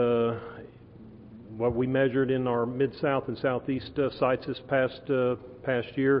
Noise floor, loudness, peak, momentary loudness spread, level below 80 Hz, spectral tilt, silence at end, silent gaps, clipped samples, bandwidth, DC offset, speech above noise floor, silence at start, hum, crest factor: -49 dBFS; -28 LUFS; -12 dBFS; 15 LU; -56 dBFS; -11 dB/octave; 0 s; none; under 0.1%; 5.4 kHz; under 0.1%; 22 dB; 0 s; none; 16 dB